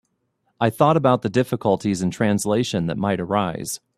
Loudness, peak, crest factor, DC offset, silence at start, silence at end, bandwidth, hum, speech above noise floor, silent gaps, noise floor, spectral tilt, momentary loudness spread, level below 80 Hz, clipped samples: -21 LUFS; -2 dBFS; 20 dB; under 0.1%; 0.6 s; 0.2 s; 15.5 kHz; none; 50 dB; none; -70 dBFS; -6 dB/octave; 6 LU; -56 dBFS; under 0.1%